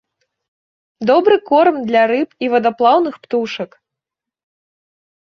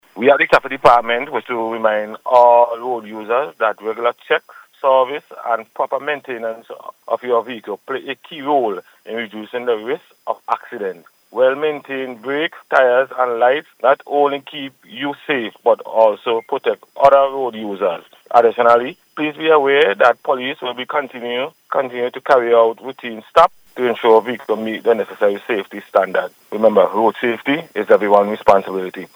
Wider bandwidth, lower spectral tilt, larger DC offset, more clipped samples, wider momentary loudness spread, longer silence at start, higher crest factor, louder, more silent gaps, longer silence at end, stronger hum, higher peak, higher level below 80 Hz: second, 6.6 kHz vs over 20 kHz; about the same, -6 dB/octave vs -5.5 dB/octave; neither; neither; second, 10 LU vs 14 LU; first, 1 s vs 0.15 s; about the same, 16 dB vs 16 dB; about the same, -15 LUFS vs -17 LUFS; neither; first, 1.6 s vs 0.1 s; neither; about the same, -2 dBFS vs 0 dBFS; second, -66 dBFS vs -58 dBFS